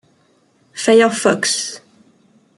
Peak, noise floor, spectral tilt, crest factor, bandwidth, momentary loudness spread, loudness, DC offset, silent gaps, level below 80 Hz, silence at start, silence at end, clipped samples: -2 dBFS; -57 dBFS; -2.5 dB/octave; 16 dB; 12 kHz; 20 LU; -15 LUFS; under 0.1%; none; -64 dBFS; 0.75 s; 0.8 s; under 0.1%